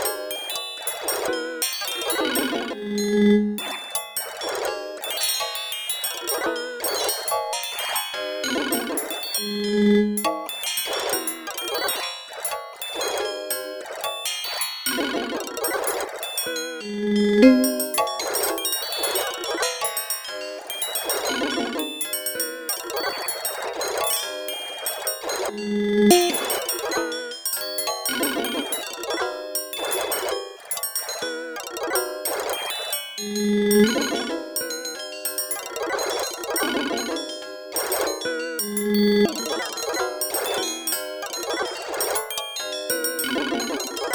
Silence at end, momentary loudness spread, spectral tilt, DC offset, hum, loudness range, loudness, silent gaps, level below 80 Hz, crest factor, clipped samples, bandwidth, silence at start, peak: 0 s; 8 LU; -2.5 dB/octave; under 0.1%; none; 5 LU; -24 LUFS; none; -60 dBFS; 22 dB; under 0.1%; over 20 kHz; 0 s; -2 dBFS